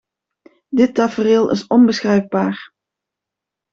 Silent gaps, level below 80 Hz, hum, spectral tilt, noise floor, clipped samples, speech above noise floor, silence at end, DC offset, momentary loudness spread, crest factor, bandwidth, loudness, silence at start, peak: none; -58 dBFS; none; -6.5 dB/octave; -84 dBFS; under 0.1%; 69 dB; 1.1 s; under 0.1%; 9 LU; 14 dB; 7.4 kHz; -16 LUFS; 0.7 s; -2 dBFS